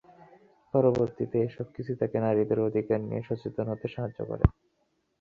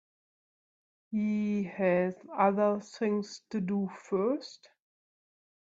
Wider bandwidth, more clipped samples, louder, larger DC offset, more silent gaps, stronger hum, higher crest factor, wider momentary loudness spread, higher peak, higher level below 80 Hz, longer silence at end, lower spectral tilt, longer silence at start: second, 7 kHz vs 7.8 kHz; neither; about the same, -29 LUFS vs -31 LUFS; neither; neither; neither; about the same, 22 dB vs 20 dB; about the same, 9 LU vs 9 LU; first, -6 dBFS vs -14 dBFS; first, -42 dBFS vs -76 dBFS; second, 0.7 s vs 1.1 s; first, -10.5 dB/octave vs -7 dB/octave; second, 0.75 s vs 1.1 s